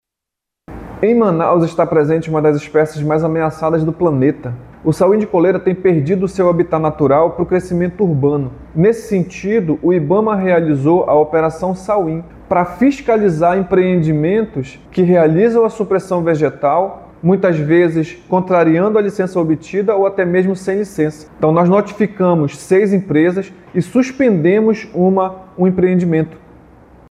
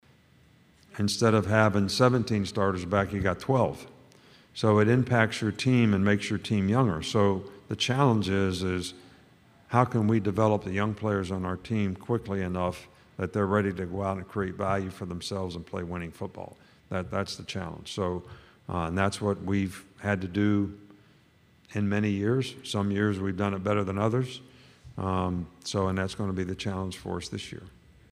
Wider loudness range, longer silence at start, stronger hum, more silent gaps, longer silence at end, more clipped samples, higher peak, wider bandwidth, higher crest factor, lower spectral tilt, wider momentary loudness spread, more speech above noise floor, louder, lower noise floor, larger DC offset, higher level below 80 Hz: second, 1 LU vs 7 LU; second, 0.7 s vs 0.95 s; neither; neither; first, 0.75 s vs 0.45 s; neither; first, -2 dBFS vs -6 dBFS; second, 12 kHz vs 13.5 kHz; second, 12 dB vs 22 dB; first, -8.5 dB/octave vs -6 dB/octave; second, 7 LU vs 13 LU; first, 68 dB vs 33 dB; first, -14 LUFS vs -28 LUFS; first, -82 dBFS vs -61 dBFS; neither; first, -46 dBFS vs -56 dBFS